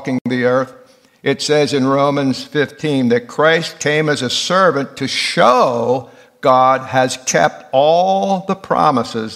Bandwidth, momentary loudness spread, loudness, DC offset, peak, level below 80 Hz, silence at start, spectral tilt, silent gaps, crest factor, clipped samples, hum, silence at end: 15 kHz; 7 LU; -15 LUFS; under 0.1%; 0 dBFS; -62 dBFS; 0 s; -4.5 dB/octave; 0.21-0.25 s; 16 dB; under 0.1%; none; 0 s